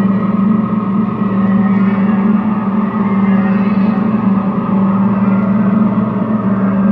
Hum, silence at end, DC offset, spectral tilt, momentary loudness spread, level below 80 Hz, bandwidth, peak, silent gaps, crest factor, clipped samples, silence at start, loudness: none; 0 s; under 0.1%; -11.5 dB/octave; 3 LU; -46 dBFS; 3.9 kHz; -2 dBFS; none; 10 dB; under 0.1%; 0 s; -13 LUFS